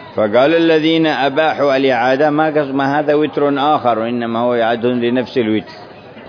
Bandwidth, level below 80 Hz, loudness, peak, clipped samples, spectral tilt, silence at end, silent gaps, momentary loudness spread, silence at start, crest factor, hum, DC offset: 5.4 kHz; -60 dBFS; -14 LUFS; -2 dBFS; under 0.1%; -7 dB/octave; 0 s; none; 5 LU; 0 s; 14 dB; none; under 0.1%